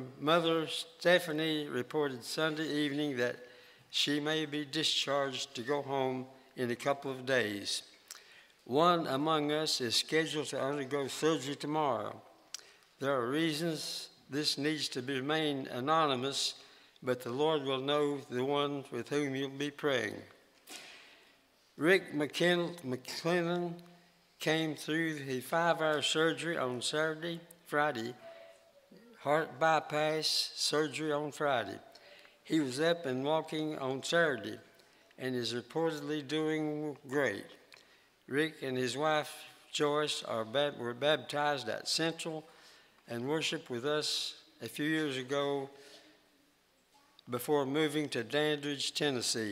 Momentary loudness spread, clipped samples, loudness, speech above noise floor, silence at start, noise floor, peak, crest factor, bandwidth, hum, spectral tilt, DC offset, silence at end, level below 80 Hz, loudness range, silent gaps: 12 LU; under 0.1%; -33 LUFS; 37 dB; 0 s; -70 dBFS; -12 dBFS; 22 dB; 16 kHz; none; -4 dB/octave; under 0.1%; 0 s; -82 dBFS; 4 LU; none